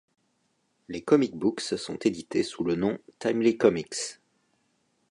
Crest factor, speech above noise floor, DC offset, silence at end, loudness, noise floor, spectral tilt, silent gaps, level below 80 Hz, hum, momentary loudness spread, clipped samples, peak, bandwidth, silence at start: 22 dB; 46 dB; under 0.1%; 0.95 s; -27 LUFS; -73 dBFS; -5 dB/octave; none; -64 dBFS; none; 11 LU; under 0.1%; -6 dBFS; 11 kHz; 0.9 s